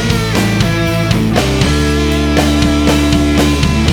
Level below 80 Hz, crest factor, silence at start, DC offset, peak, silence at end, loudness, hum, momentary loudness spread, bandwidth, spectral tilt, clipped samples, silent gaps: -20 dBFS; 12 dB; 0 s; under 0.1%; 0 dBFS; 0 s; -12 LUFS; none; 2 LU; 19.5 kHz; -5.5 dB/octave; under 0.1%; none